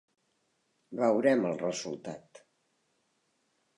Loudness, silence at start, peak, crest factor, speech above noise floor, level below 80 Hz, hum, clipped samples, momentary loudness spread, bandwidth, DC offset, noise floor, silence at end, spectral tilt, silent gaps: -29 LUFS; 0.9 s; -12 dBFS; 20 dB; 47 dB; -80 dBFS; none; under 0.1%; 18 LU; 11 kHz; under 0.1%; -76 dBFS; 1.6 s; -5 dB/octave; none